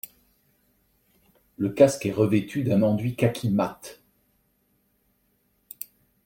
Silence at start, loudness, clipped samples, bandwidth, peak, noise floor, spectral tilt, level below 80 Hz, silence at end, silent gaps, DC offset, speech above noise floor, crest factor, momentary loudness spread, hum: 1.6 s; -24 LUFS; under 0.1%; 16.5 kHz; -4 dBFS; -69 dBFS; -7 dB/octave; -62 dBFS; 2.3 s; none; under 0.1%; 46 dB; 22 dB; 23 LU; none